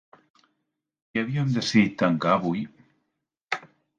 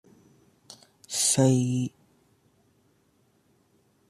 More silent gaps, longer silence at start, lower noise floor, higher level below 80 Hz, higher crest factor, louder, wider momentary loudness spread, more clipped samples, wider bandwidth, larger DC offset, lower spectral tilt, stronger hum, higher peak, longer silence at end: first, 3.44-3.48 s vs none; about the same, 1.15 s vs 1.1 s; first, -80 dBFS vs -67 dBFS; first, -64 dBFS vs -70 dBFS; about the same, 20 dB vs 22 dB; about the same, -25 LUFS vs -24 LUFS; second, 12 LU vs 15 LU; neither; second, 9.2 kHz vs 13.5 kHz; neither; first, -6 dB/octave vs -4.5 dB/octave; neither; about the same, -8 dBFS vs -8 dBFS; second, 0.35 s vs 2.2 s